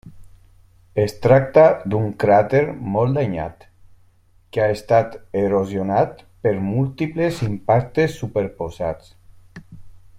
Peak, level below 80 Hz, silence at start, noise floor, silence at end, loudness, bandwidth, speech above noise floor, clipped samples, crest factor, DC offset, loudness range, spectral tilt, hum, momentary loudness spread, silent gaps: -2 dBFS; -48 dBFS; 0.05 s; -54 dBFS; 0 s; -19 LUFS; 15 kHz; 35 dB; under 0.1%; 18 dB; under 0.1%; 5 LU; -8 dB/octave; none; 12 LU; none